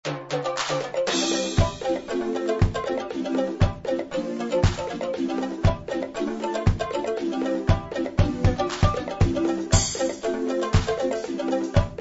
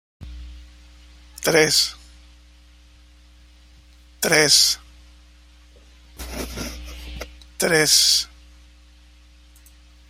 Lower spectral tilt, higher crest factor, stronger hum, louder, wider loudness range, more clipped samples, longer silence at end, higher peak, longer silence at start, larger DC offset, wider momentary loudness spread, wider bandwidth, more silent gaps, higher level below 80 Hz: first, -5.5 dB/octave vs -1 dB/octave; about the same, 20 dB vs 24 dB; second, none vs 60 Hz at -45 dBFS; second, -25 LUFS vs -17 LUFS; about the same, 2 LU vs 3 LU; neither; second, 0 s vs 1.85 s; second, -4 dBFS vs 0 dBFS; second, 0.05 s vs 0.2 s; neither; second, 6 LU vs 25 LU; second, 8 kHz vs 16 kHz; neither; first, -34 dBFS vs -44 dBFS